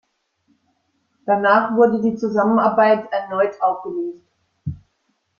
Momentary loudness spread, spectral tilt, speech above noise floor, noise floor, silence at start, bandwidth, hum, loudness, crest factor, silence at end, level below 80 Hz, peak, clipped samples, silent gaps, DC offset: 17 LU; -8 dB/octave; 52 dB; -69 dBFS; 1.25 s; 7 kHz; none; -18 LUFS; 18 dB; 0.65 s; -58 dBFS; -2 dBFS; under 0.1%; none; under 0.1%